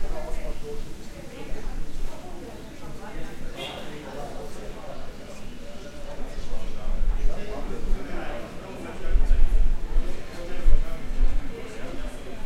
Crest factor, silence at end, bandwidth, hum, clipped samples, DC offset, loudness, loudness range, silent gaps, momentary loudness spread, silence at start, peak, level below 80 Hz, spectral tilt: 18 dB; 0 s; 8 kHz; none; under 0.1%; under 0.1%; -34 LUFS; 8 LU; none; 12 LU; 0 s; -4 dBFS; -26 dBFS; -5.5 dB/octave